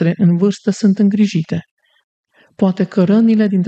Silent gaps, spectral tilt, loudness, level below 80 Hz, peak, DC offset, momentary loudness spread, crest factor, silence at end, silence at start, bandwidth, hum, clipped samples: 1.71-1.77 s, 2.04-2.24 s; -8 dB/octave; -14 LUFS; -60 dBFS; -2 dBFS; under 0.1%; 7 LU; 12 dB; 0 s; 0 s; 8.4 kHz; none; under 0.1%